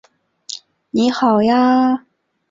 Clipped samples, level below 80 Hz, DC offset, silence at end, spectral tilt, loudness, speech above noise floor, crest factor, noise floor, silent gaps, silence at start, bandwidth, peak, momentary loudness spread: under 0.1%; -58 dBFS; under 0.1%; 0.5 s; -5.5 dB/octave; -15 LUFS; 25 dB; 14 dB; -39 dBFS; none; 0.5 s; 7.6 kHz; -4 dBFS; 18 LU